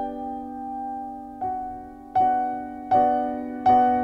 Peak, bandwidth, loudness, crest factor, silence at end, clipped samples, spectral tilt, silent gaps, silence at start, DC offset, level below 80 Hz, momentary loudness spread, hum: -8 dBFS; 5.8 kHz; -25 LUFS; 16 dB; 0 s; under 0.1%; -7.5 dB/octave; none; 0 s; under 0.1%; -54 dBFS; 14 LU; none